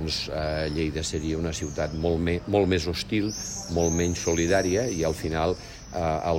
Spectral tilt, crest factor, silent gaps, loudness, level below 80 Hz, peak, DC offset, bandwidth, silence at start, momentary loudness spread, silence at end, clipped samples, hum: -4.5 dB/octave; 16 dB; none; -26 LUFS; -40 dBFS; -10 dBFS; under 0.1%; 16 kHz; 0 s; 7 LU; 0 s; under 0.1%; none